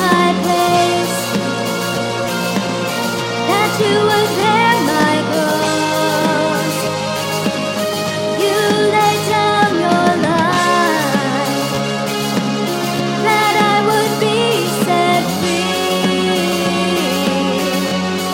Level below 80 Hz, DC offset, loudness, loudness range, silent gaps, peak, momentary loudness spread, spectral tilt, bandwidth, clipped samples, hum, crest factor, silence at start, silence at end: -54 dBFS; under 0.1%; -15 LUFS; 2 LU; none; 0 dBFS; 6 LU; -4 dB/octave; 16.5 kHz; under 0.1%; none; 16 dB; 0 s; 0 s